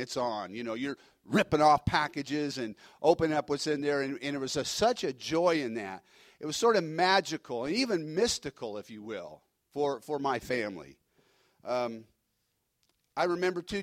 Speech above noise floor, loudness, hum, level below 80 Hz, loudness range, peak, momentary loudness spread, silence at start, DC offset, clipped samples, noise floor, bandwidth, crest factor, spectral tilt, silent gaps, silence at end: 48 dB; -30 LUFS; none; -60 dBFS; 7 LU; -10 dBFS; 15 LU; 0 s; under 0.1%; under 0.1%; -79 dBFS; 16 kHz; 22 dB; -4 dB/octave; none; 0 s